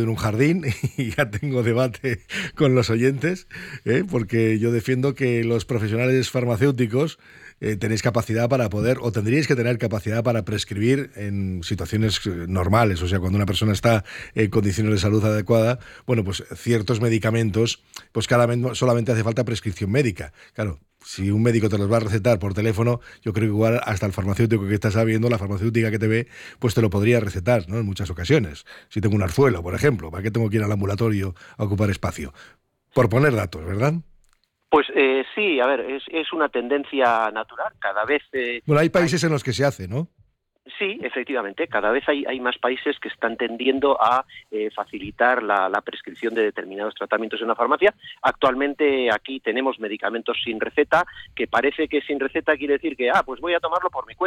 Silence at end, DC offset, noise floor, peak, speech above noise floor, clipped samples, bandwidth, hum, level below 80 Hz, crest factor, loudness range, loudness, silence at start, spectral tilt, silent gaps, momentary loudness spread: 0 s; under 0.1%; -63 dBFS; -6 dBFS; 41 dB; under 0.1%; 16 kHz; none; -48 dBFS; 16 dB; 2 LU; -22 LUFS; 0 s; -6 dB/octave; none; 9 LU